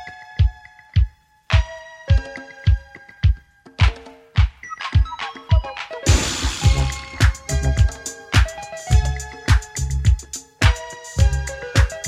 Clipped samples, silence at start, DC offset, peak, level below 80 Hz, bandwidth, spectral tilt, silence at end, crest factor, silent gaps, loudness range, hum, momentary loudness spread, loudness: under 0.1%; 0 s; under 0.1%; -2 dBFS; -22 dBFS; 13.5 kHz; -4.5 dB/octave; 0 s; 18 dB; none; 3 LU; none; 11 LU; -21 LUFS